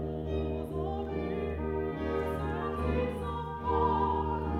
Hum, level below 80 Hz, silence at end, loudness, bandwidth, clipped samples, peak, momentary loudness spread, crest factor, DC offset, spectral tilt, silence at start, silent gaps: none; -40 dBFS; 0 s; -33 LUFS; 11.5 kHz; under 0.1%; -16 dBFS; 6 LU; 16 dB; under 0.1%; -8.5 dB/octave; 0 s; none